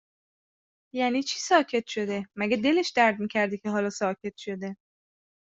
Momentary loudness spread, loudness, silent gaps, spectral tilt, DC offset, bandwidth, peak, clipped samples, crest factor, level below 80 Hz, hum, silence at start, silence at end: 12 LU; -26 LUFS; none; -4 dB/octave; under 0.1%; 8 kHz; -8 dBFS; under 0.1%; 20 dB; -72 dBFS; none; 0.95 s; 0.65 s